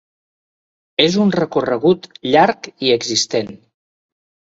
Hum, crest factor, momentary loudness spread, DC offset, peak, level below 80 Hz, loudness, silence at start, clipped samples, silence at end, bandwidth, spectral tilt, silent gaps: none; 18 dB; 7 LU; under 0.1%; 0 dBFS; -58 dBFS; -16 LUFS; 1 s; under 0.1%; 1 s; 8 kHz; -4 dB/octave; none